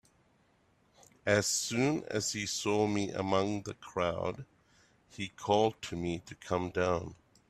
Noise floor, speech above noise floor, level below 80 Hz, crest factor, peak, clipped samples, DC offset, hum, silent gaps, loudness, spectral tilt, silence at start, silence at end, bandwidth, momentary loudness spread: -69 dBFS; 37 dB; -64 dBFS; 22 dB; -12 dBFS; under 0.1%; under 0.1%; none; none; -33 LUFS; -4 dB/octave; 1.25 s; 0.35 s; 15 kHz; 11 LU